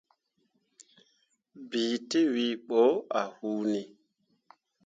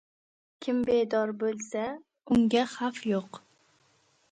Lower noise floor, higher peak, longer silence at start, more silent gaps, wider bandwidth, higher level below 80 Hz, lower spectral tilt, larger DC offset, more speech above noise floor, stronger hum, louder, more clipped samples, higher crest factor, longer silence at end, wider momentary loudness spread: first, -75 dBFS vs -67 dBFS; about the same, -12 dBFS vs -12 dBFS; first, 1.55 s vs 0.6 s; neither; about the same, 9 kHz vs 9.2 kHz; second, -82 dBFS vs -64 dBFS; about the same, -4.5 dB/octave vs -5.5 dB/octave; neither; first, 47 dB vs 40 dB; neither; about the same, -29 LUFS vs -29 LUFS; neither; about the same, 20 dB vs 18 dB; about the same, 1 s vs 0.95 s; second, 11 LU vs 14 LU